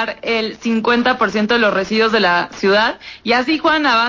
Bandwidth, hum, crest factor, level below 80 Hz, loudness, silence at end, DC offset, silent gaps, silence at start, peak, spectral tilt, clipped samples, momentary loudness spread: 7.6 kHz; none; 12 dB; -50 dBFS; -15 LUFS; 0 s; under 0.1%; none; 0 s; -4 dBFS; -4.5 dB/octave; under 0.1%; 6 LU